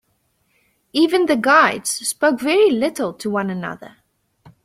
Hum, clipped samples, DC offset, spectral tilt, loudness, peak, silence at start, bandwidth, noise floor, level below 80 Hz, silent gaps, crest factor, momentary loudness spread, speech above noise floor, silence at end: none; under 0.1%; under 0.1%; -3.5 dB/octave; -17 LUFS; -2 dBFS; 0.95 s; 15.5 kHz; -66 dBFS; -62 dBFS; none; 18 dB; 12 LU; 48 dB; 0.75 s